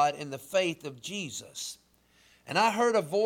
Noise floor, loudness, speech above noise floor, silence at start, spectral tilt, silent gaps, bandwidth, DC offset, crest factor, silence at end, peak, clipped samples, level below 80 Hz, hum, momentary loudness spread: -64 dBFS; -30 LUFS; 34 dB; 0 s; -3.5 dB/octave; none; 18 kHz; under 0.1%; 16 dB; 0 s; -14 dBFS; under 0.1%; -74 dBFS; none; 14 LU